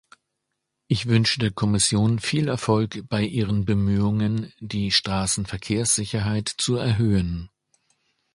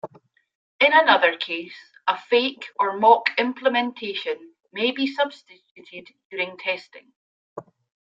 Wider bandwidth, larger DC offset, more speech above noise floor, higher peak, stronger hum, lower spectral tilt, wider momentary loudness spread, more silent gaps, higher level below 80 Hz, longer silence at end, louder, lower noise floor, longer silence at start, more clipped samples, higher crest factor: first, 11.5 kHz vs 7.6 kHz; neither; first, 57 dB vs 34 dB; about the same, -4 dBFS vs -2 dBFS; neither; about the same, -4.5 dB/octave vs -4.5 dB/octave; second, 7 LU vs 25 LU; second, none vs 0.55-0.79 s, 5.71-5.75 s, 6.25-6.30 s, 7.15-7.56 s; first, -44 dBFS vs -78 dBFS; first, 0.9 s vs 0.45 s; about the same, -23 LUFS vs -21 LUFS; first, -79 dBFS vs -56 dBFS; first, 0.9 s vs 0.05 s; neither; about the same, 20 dB vs 22 dB